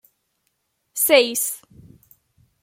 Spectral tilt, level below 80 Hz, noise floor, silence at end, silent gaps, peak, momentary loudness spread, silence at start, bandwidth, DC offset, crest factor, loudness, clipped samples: -0.5 dB/octave; -68 dBFS; -72 dBFS; 1.05 s; none; -2 dBFS; 18 LU; 0.95 s; 16.5 kHz; under 0.1%; 22 dB; -18 LUFS; under 0.1%